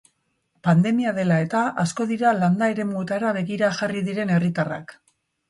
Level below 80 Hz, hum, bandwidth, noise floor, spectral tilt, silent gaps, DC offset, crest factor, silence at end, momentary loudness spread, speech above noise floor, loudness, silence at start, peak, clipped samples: -64 dBFS; none; 11.5 kHz; -70 dBFS; -7 dB/octave; none; under 0.1%; 16 dB; 0.55 s; 7 LU; 49 dB; -22 LUFS; 0.65 s; -6 dBFS; under 0.1%